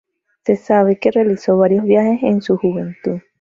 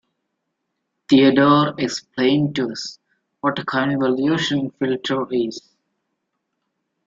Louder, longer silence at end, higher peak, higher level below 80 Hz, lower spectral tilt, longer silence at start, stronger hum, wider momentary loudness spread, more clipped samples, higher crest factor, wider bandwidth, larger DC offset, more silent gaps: first, -16 LUFS vs -19 LUFS; second, 0.2 s vs 1.5 s; about the same, -2 dBFS vs -4 dBFS; about the same, -58 dBFS vs -62 dBFS; first, -8.5 dB/octave vs -5.5 dB/octave; second, 0.45 s vs 1.1 s; neither; about the same, 10 LU vs 11 LU; neither; about the same, 14 dB vs 18 dB; about the same, 7.4 kHz vs 7.6 kHz; neither; neither